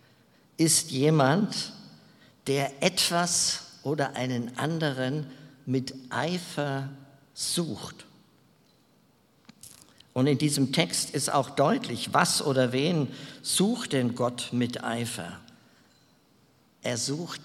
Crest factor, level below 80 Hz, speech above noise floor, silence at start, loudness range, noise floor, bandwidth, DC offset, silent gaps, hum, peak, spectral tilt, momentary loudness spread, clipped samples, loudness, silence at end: 24 dB; -70 dBFS; 36 dB; 0.6 s; 8 LU; -63 dBFS; 16.5 kHz; under 0.1%; none; none; -4 dBFS; -4 dB/octave; 13 LU; under 0.1%; -27 LUFS; 0 s